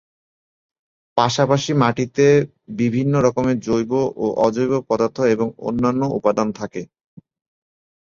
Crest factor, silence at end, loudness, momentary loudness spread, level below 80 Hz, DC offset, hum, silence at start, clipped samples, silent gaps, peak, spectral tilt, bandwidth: 18 dB; 1.15 s; -19 LUFS; 7 LU; -54 dBFS; under 0.1%; none; 1.15 s; under 0.1%; none; -2 dBFS; -6.5 dB/octave; 7.6 kHz